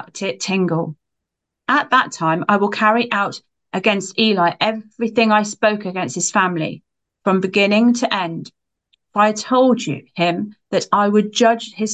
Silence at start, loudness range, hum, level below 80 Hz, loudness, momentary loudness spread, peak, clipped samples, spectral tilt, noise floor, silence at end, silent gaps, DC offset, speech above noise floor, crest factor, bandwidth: 0 s; 1 LU; none; -68 dBFS; -18 LUFS; 10 LU; -2 dBFS; under 0.1%; -4 dB/octave; -80 dBFS; 0 s; none; under 0.1%; 63 dB; 16 dB; 9.2 kHz